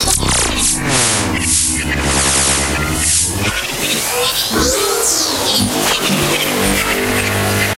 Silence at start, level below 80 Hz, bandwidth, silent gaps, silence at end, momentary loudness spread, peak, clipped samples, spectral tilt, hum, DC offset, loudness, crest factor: 0 s; -28 dBFS; 16 kHz; none; 0 s; 3 LU; 0 dBFS; under 0.1%; -2 dB/octave; none; under 0.1%; -13 LUFS; 16 dB